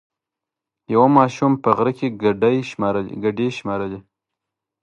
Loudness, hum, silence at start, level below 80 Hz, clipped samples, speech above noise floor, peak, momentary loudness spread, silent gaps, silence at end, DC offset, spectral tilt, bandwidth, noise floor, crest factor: -19 LUFS; none; 0.9 s; -56 dBFS; under 0.1%; 67 dB; 0 dBFS; 11 LU; none; 0.85 s; under 0.1%; -7.5 dB/octave; 8.4 kHz; -85 dBFS; 20 dB